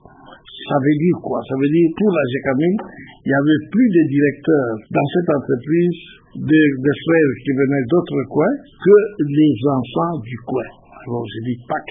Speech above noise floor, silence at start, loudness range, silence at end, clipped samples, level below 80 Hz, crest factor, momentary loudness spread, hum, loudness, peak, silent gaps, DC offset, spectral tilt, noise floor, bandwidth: 26 dB; 0.3 s; 2 LU; 0 s; under 0.1%; -54 dBFS; 16 dB; 12 LU; none; -17 LUFS; -2 dBFS; none; under 0.1%; -12.5 dB/octave; -43 dBFS; 3.8 kHz